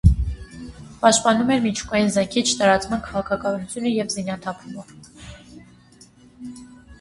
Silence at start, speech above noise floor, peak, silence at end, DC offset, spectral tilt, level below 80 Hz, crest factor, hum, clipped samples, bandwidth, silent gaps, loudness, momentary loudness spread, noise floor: 0.05 s; 29 dB; 0 dBFS; 0.05 s; under 0.1%; -4.5 dB/octave; -32 dBFS; 22 dB; none; under 0.1%; 11.5 kHz; none; -21 LUFS; 22 LU; -50 dBFS